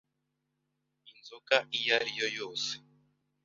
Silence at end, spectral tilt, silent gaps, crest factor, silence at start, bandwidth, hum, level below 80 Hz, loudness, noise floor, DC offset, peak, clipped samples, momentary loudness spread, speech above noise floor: 0.65 s; 1 dB/octave; none; 28 dB; 1.05 s; 7.4 kHz; none; -82 dBFS; -30 LUFS; -82 dBFS; under 0.1%; -8 dBFS; under 0.1%; 18 LU; 50 dB